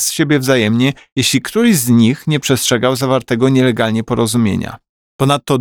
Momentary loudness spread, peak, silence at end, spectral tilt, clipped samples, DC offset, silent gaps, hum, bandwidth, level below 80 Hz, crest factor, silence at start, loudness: 5 LU; 0 dBFS; 0 s; -4.5 dB/octave; under 0.1%; 0.1%; 1.12-1.16 s, 4.89-5.19 s; none; 20 kHz; -48 dBFS; 12 dB; 0 s; -14 LUFS